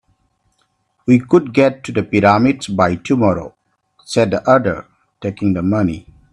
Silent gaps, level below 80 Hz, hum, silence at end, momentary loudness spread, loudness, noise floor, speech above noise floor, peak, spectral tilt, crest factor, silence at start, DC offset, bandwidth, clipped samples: none; -48 dBFS; none; 0.3 s; 14 LU; -15 LUFS; -64 dBFS; 50 dB; 0 dBFS; -7 dB/octave; 16 dB; 1.05 s; under 0.1%; 11 kHz; under 0.1%